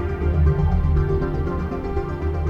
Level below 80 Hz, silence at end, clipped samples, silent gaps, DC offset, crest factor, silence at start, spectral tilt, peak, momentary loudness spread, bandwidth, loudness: -24 dBFS; 0 s; under 0.1%; none; under 0.1%; 12 dB; 0 s; -10 dB/octave; -8 dBFS; 7 LU; 5.4 kHz; -22 LUFS